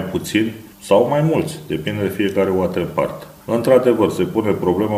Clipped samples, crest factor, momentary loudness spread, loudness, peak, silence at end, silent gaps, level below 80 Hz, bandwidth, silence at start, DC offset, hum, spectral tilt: under 0.1%; 18 dB; 10 LU; -18 LUFS; 0 dBFS; 0 s; none; -50 dBFS; 16 kHz; 0 s; under 0.1%; none; -6.5 dB/octave